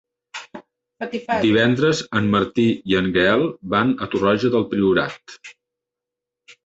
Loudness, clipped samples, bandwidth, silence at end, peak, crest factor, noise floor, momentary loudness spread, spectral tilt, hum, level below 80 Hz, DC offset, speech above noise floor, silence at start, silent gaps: -19 LUFS; under 0.1%; 8 kHz; 1.15 s; -2 dBFS; 18 dB; -85 dBFS; 19 LU; -6 dB/octave; none; -50 dBFS; under 0.1%; 66 dB; 0.35 s; none